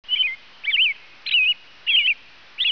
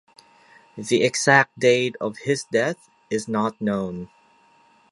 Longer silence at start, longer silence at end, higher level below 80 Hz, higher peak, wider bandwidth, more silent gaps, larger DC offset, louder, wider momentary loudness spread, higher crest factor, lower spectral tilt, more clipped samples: second, 0.1 s vs 0.75 s; second, 0 s vs 0.85 s; second, -72 dBFS vs -64 dBFS; second, -10 dBFS vs 0 dBFS; second, 5.4 kHz vs 11.5 kHz; neither; first, 0.3% vs under 0.1%; first, -19 LUFS vs -22 LUFS; second, 9 LU vs 17 LU; second, 12 dB vs 22 dB; second, 1 dB/octave vs -4 dB/octave; neither